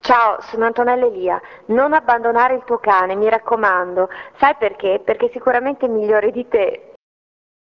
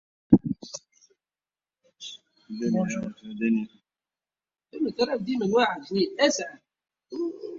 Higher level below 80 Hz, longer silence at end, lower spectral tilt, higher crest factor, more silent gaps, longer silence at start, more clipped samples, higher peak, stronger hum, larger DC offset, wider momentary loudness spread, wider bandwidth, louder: about the same, -56 dBFS vs -58 dBFS; first, 0.9 s vs 0 s; about the same, -6 dB/octave vs -5 dB/octave; second, 16 dB vs 26 dB; neither; second, 0.05 s vs 0.3 s; neither; about the same, -2 dBFS vs -2 dBFS; neither; neither; second, 6 LU vs 19 LU; second, 6.4 kHz vs 7.6 kHz; first, -17 LUFS vs -26 LUFS